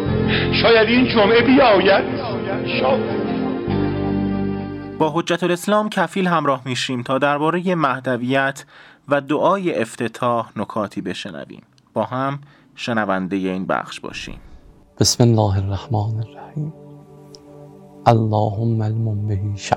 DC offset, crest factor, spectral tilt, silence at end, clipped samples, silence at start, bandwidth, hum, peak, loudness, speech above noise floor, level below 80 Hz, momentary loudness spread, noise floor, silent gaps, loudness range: under 0.1%; 20 dB; -5.5 dB/octave; 0 s; under 0.1%; 0 s; 16.5 kHz; none; 0 dBFS; -19 LUFS; 26 dB; -46 dBFS; 15 LU; -44 dBFS; none; 8 LU